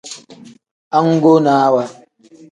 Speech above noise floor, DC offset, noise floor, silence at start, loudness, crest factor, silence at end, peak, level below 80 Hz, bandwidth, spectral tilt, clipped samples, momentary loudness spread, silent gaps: 32 dB; under 0.1%; -44 dBFS; 0.05 s; -13 LUFS; 16 dB; 0.6 s; 0 dBFS; -66 dBFS; 10.5 kHz; -7 dB/octave; under 0.1%; 20 LU; 0.71-0.91 s